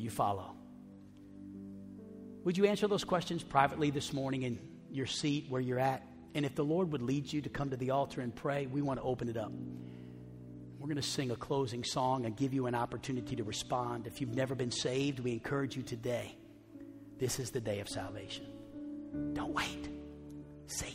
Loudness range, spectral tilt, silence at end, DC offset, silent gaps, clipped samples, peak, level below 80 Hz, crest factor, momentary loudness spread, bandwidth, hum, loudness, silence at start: 6 LU; -5 dB/octave; 0 s; under 0.1%; none; under 0.1%; -12 dBFS; -62 dBFS; 24 dB; 17 LU; 16 kHz; none; -36 LUFS; 0 s